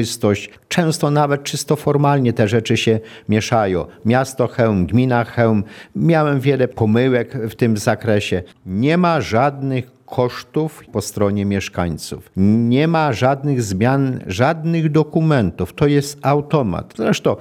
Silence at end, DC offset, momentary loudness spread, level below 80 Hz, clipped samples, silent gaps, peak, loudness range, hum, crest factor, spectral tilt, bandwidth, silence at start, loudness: 0 s; under 0.1%; 7 LU; -48 dBFS; under 0.1%; none; 0 dBFS; 2 LU; none; 16 dB; -6.5 dB/octave; 17.5 kHz; 0 s; -18 LUFS